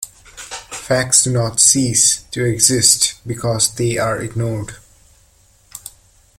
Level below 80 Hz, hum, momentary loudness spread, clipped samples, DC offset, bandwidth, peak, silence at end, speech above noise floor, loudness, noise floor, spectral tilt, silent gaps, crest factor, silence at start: -46 dBFS; none; 20 LU; under 0.1%; under 0.1%; over 20 kHz; 0 dBFS; 0.5 s; 37 dB; -14 LUFS; -53 dBFS; -2.5 dB/octave; none; 18 dB; 0 s